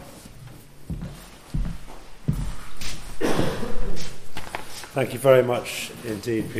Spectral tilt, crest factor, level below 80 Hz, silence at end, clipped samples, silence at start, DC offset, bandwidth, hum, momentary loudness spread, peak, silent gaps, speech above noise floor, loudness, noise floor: -5.5 dB/octave; 18 dB; -36 dBFS; 0 s; under 0.1%; 0 s; under 0.1%; 15.5 kHz; none; 24 LU; -4 dBFS; none; 20 dB; -27 LUFS; -43 dBFS